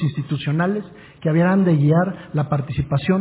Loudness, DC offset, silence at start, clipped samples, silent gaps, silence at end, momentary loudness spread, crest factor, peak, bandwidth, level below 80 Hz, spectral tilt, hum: -20 LUFS; under 0.1%; 0 s; under 0.1%; none; 0 s; 9 LU; 12 dB; -6 dBFS; 4 kHz; -46 dBFS; -12 dB/octave; none